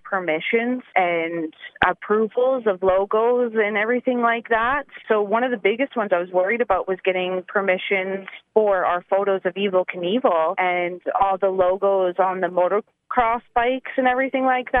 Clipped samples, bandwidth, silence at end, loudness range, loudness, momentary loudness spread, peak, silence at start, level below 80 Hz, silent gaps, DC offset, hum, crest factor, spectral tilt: under 0.1%; 3.9 kHz; 0 s; 1 LU; -21 LUFS; 4 LU; -2 dBFS; 0.05 s; -54 dBFS; none; under 0.1%; none; 20 dB; -8 dB/octave